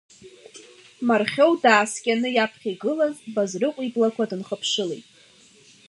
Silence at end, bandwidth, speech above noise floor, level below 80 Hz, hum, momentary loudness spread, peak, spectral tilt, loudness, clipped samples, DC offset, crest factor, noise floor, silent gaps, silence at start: 0.9 s; 11.5 kHz; 31 dB; -76 dBFS; none; 10 LU; -2 dBFS; -3.5 dB/octave; -22 LUFS; under 0.1%; under 0.1%; 22 dB; -53 dBFS; none; 0.25 s